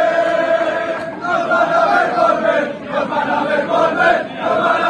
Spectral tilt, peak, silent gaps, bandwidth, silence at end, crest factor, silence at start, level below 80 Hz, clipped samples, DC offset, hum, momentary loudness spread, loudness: -5 dB/octave; -2 dBFS; none; 9.6 kHz; 0 s; 14 dB; 0 s; -56 dBFS; under 0.1%; under 0.1%; none; 7 LU; -16 LUFS